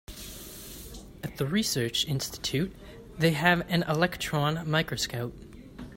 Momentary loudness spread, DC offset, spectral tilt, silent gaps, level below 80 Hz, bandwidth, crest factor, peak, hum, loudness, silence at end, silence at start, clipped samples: 20 LU; under 0.1%; -4.5 dB/octave; none; -50 dBFS; 16.5 kHz; 22 dB; -8 dBFS; none; -28 LUFS; 0 s; 0.1 s; under 0.1%